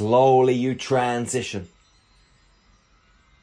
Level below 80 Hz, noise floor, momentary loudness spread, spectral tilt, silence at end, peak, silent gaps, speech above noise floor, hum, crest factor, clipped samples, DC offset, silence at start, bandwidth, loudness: -60 dBFS; -59 dBFS; 13 LU; -5.5 dB/octave; 1.75 s; -6 dBFS; none; 39 dB; none; 18 dB; under 0.1%; under 0.1%; 0 s; 10.5 kHz; -21 LUFS